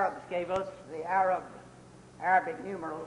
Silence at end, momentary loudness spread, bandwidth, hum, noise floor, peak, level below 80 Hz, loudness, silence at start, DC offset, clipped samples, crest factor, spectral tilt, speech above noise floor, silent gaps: 0 s; 13 LU; 11 kHz; none; -53 dBFS; -14 dBFS; -66 dBFS; -31 LUFS; 0 s; under 0.1%; under 0.1%; 18 dB; -5.5 dB/octave; 22 dB; none